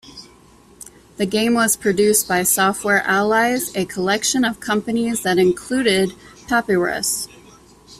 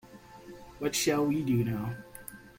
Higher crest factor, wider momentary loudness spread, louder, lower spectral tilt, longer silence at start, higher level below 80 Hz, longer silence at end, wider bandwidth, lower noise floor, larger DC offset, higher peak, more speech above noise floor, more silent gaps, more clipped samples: about the same, 16 dB vs 18 dB; second, 7 LU vs 22 LU; first, -18 LUFS vs -30 LUFS; second, -3 dB/octave vs -5 dB/octave; about the same, 0.05 s vs 0.05 s; first, -52 dBFS vs -58 dBFS; about the same, 0.05 s vs 0.1 s; about the same, 15.5 kHz vs 16.5 kHz; about the same, -48 dBFS vs -50 dBFS; neither; first, -2 dBFS vs -14 dBFS; first, 30 dB vs 21 dB; neither; neither